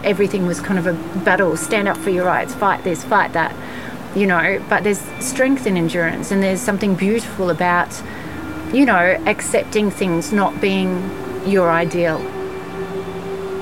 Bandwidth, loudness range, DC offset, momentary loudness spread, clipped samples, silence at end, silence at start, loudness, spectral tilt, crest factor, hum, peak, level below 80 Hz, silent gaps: 16.5 kHz; 1 LU; 1%; 11 LU; under 0.1%; 0 s; 0 s; -18 LUFS; -5 dB/octave; 16 dB; none; -2 dBFS; -48 dBFS; none